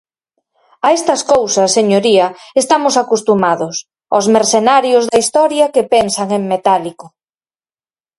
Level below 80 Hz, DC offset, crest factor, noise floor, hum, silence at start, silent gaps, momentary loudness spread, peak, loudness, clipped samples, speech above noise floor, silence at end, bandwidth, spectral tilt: -56 dBFS; under 0.1%; 14 dB; under -90 dBFS; none; 0.85 s; none; 6 LU; 0 dBFS; -12 LUFS; under 0.1%; over 78 dB; 1.1 s; 11.5 kHz; -3.5 dB/octave